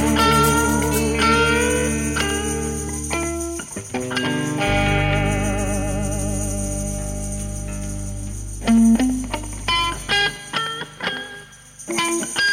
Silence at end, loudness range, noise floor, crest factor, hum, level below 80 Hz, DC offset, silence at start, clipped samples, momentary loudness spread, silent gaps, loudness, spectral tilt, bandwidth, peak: 0 s; 4 LU; -41 dBFS; 16 dB; 50 Hz at -30 dBFS; -32 dBFS; under 0.1%; 0 s; under 0.1%; 13 LU; none; -21 LUFS; -4 dB/octave; 16.5 kHz; -4 dBFS